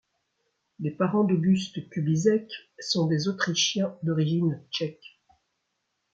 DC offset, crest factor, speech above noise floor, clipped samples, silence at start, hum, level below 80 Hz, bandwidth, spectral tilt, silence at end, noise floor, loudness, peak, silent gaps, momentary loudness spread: under 0.1%; 18 dB; 53 dB; under 0.1%; 0.8 s; none; -70 dBFS; 7.8 kHz; -5 dB/octave; 1.2 s; -78 dBFS; -26 LUFS; -10 dBFS; none; 11 LU